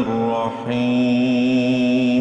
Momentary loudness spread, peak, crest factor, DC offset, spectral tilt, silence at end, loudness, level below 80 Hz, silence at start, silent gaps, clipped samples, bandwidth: 5 LU; -8 dBFS; 10 dB; under 0.1%; -7 dB/octave; 0 s; -19 LUFS; -56 dBFS; 0 s; none; under 0.1%; 8 kHz